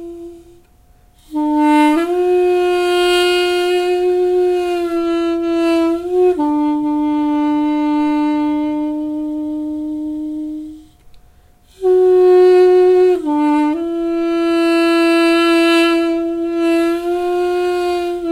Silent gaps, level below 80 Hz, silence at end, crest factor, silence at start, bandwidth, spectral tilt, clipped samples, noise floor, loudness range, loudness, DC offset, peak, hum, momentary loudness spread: none; -48 dBFS; 0 s; 12 dB; 0 s; 13 kHz; -4 dB/octave; under 0.1%; -49 dBFS; 6 LU; -15 LUFS; under 0.1%; -4 dBFS; none; 11 LU